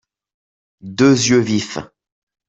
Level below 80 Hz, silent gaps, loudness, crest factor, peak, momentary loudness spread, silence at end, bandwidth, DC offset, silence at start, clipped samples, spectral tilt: -56 dBFS; none; -15 LUFS; 16 dB; -2 dBFS; 17 LU; 0.65 s; 8 kHz; under 0.1%; 0.85 s; under 0.1%; -4.5 dB/octave